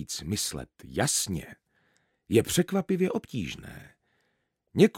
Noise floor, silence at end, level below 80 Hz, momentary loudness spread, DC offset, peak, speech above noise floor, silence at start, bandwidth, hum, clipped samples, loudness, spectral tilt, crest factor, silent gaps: -76 dBFS; 0 s; -54 dBFS; 17 LU; under 0.1%; -6 dBFS; 47 dB; 0 s; 17 kHz; none; under 0.1%; -28 LUFS; -4.5 dB/octave; 22 dB; none